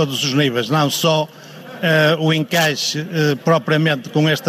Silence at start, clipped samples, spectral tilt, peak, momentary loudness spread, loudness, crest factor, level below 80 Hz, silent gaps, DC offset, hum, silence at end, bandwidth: 0 s; under 0.1%; -4.5 dB/octave; -2 dBFS; 5 LU; -17 LUFS; 14 dB; -66 dBFS; none; under 0.1%; none; 0 s; 16 kHz